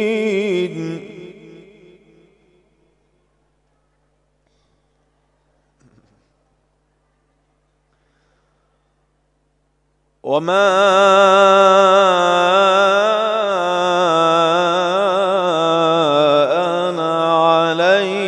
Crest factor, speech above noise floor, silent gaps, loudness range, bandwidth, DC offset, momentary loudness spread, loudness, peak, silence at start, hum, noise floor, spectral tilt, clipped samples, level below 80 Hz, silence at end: 18 dB; 52 dB; none; 14 LU; 10.5 kHz; under 0.1%; 10 LU; -14 LUFS; 0 dBFS; 0 s; 50 Hz at -65 dBFS; -64 dBFS; -4.5 dB/octave; under 0.1%; -66 dBFS; 0 s